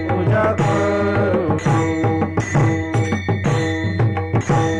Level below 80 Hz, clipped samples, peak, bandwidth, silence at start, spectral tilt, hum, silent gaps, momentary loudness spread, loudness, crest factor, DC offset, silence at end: -42 dBFS; under 0.1%; -6 dBFS; 10 kHz; 0 s; -7 dB/octave; none; none; 3 LU; -18 LUFS; 10 dB; under 0.1%; 0 s